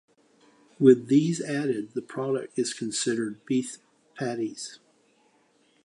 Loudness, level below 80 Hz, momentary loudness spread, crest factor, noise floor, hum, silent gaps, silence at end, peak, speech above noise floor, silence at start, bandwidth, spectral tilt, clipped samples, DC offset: -26 LUFS; -78 dBFS; 15 LU; 22 dB; -65 dBFS; none; none; 1.1 s; -4 dBFS; 39 dB; 0.8 s; 11 kHz; -5 dB/octave; under 0.1%; under 0.1%